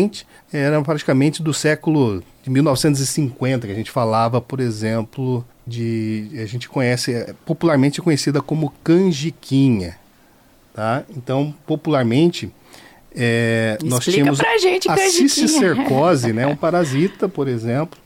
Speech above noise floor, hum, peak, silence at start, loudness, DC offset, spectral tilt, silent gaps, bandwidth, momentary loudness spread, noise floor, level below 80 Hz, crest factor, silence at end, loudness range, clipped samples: 33 dB; none; -6 dBFS; 0 s; -18 LUFS; under 0.1%; -5.5 dB/octave; none; 17 kHz; 10 LU; -51 dBFS; -54 dBFS; 14 dB; 0.2 s; 6 LU; under 0.1%